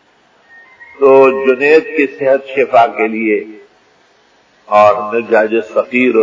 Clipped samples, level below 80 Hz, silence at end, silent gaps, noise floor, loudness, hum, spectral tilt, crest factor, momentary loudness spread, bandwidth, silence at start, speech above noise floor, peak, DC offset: 0.2%; -62 dBFS; 0 s; none; -51 dBFS; -11 LUFS; none; -6 dB/octave; 12 dB; 8 LU; 7.6 kHz; 0.8 s; 40 dB; 0 dBFS; under 0.1%